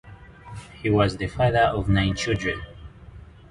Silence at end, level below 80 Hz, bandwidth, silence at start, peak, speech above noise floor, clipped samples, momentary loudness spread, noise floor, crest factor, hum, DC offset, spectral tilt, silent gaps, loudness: 0.25 s; -40 dBFS; 11 kHz; 0.05 s; -6 dBFS; 22 dB; under 0.1%; 21 LU; -44 dBFS; 18 dB; none; under 0.1%; -6 dB/octave; none; -23 LUFS